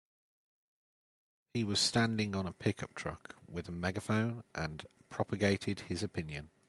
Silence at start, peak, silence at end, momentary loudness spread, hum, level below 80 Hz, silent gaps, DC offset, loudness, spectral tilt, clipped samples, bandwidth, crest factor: 1.55 s; -16 dBFS; 0.2 s; 14 LU; none; -64 dBFS; none; under 0.1%; -36 LUFS; -4.5 dB/octave; under 0.1%; 12 kHz; 20 dB